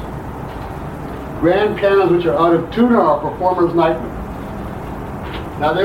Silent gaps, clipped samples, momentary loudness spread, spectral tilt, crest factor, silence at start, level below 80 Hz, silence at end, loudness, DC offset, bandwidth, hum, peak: none; under 0.1%; 14 LU; -7.5 dB/octave; 14 dB; 0 s; -36 dBFS; 0 s; -16 LUFS; under 0.1%; 16 kHz; none; -2 dBFS